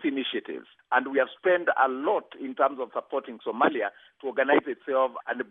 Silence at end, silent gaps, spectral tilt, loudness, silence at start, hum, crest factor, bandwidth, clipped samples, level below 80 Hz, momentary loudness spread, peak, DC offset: 0.05 s; none; -7.5 dB/octave; -27 LUFS; 0 s; none; 18 dB; 3.9 kHz; under 0.1%; -86 dBFS; 11 LU; -8 dBFS; under 0.1%